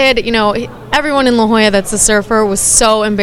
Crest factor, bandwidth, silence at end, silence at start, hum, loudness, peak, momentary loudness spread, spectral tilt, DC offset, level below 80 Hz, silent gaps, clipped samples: 12 dB; 17 kHz; 0 s; 0 s; none; -11 LUFS; 0 dBFS; 7 LU; -2.5 dB/octave; under 0.1%; -32 dBFS; none; under 0.1%